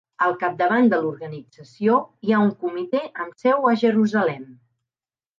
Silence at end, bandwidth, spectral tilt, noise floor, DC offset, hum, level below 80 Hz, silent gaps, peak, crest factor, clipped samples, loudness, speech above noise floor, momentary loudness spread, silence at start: 0.85 s; 7.2 kHz; -7.5 dB/octave; under -90 dBFS; under 0.1%; none; -74 dBFS; none; -6 dBFS; 16 dB; under 0.1%; -21 LUFS; over 69 dB; 13 LU; 0.2 s